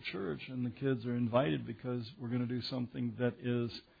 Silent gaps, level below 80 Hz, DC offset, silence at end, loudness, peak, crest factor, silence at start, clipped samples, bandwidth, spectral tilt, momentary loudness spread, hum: none; -68 dBFS; under 0.1%; 0.2 s; -37 LUFS; -18 dBFS; 18 dB; 0 s; under 0.1%; 5 kHz; -6 dB/octave; 8 LU; none